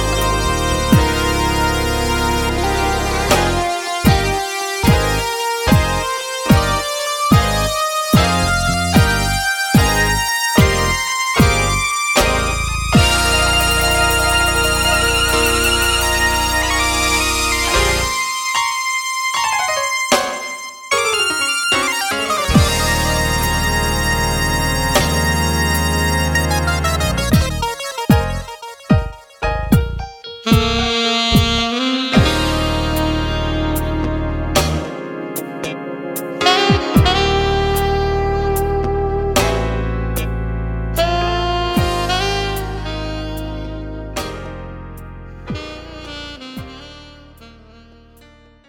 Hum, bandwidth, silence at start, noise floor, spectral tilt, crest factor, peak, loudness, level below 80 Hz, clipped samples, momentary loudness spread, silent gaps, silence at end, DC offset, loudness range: none; 18.5 kHz; 0 s; -46 dBFS; -4 dB/octave; 16 dB; 0 dBFS; -16 LUFS; -26 dBFS; under 0.1%; 12 LU; none; 1.15 s; under 0.1%; 7 LU